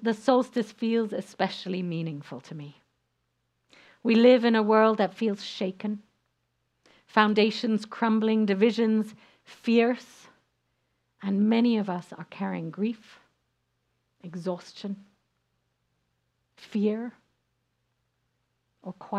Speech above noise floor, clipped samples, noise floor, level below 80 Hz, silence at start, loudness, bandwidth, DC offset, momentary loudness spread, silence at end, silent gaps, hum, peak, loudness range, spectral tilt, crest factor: 51 dB; under 0.1%; -77 dBFS; -82 dBFS; 0 s; -26 LUFS; 9.4 kHz; under 0.1%; 19 LU; 0 s; none; none; -4 dBFS; 12 LU; -6.5 dB/octave; 24 dB